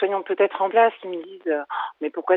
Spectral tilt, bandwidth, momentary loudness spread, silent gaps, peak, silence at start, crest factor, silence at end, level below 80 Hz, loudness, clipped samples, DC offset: -7.5 dB/octave; 4.1 kHz; 12 LU; none; -4 dBFS; 0 s; 18 dB; 0 s; -88 dBFS; -23 LUFS; under 0.1%; under 0.1%